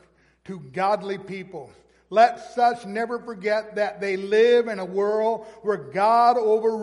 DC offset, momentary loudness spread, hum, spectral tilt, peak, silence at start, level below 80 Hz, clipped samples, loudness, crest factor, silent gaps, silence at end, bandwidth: under 0.1%; 16 LU; none; -5.5 dB/octave; -4 dBFS; 0.5 s; -68 dBFS; under 0.1%; -22 LUFS; 18 dB; none; 0 s; 11.5 kHz